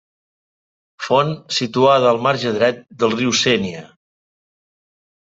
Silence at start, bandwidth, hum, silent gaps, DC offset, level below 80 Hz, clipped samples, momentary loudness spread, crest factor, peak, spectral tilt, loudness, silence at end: 1 s; 8.2 kHz; none; none; under 0.1%; -60 dBFS; under 0.1%; 8 LU; 18 dB; -2 dBFS; -4 dB/octave; -17 LUFS; 1.4 s